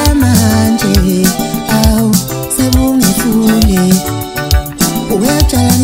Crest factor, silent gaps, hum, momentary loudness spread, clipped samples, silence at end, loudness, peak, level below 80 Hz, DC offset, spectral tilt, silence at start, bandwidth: 10 dB; none; none; 5 LU; 0.1%; 0 s; -11 LUFS; 0 dBFS; -18 dBFS; under 0.1%; -5 dB/octave; 0 s; 16.5 kHz